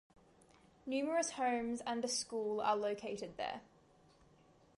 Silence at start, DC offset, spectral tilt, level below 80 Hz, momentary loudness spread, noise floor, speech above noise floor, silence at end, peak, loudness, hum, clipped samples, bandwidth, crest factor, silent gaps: 0.85 s; under 0.1%; -2.5 dB/octave; -74 dBFS; 9 LU; -67 dBFS; 29 dB; 1.15 s; -22 dBFS; -38 LUFS; none; under 0.1%; 11.5 kHz; 18 dB; none